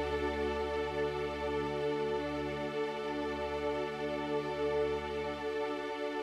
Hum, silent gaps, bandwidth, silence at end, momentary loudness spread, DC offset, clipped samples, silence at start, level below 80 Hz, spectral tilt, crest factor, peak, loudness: none; none; 12.5 kHz; 0 s; 3 LU; under 0.1%; under 0.1%; 0 s; -52 dBFS; -6 dB/octave; 12 dB; -22 dBFS; -35 LUFS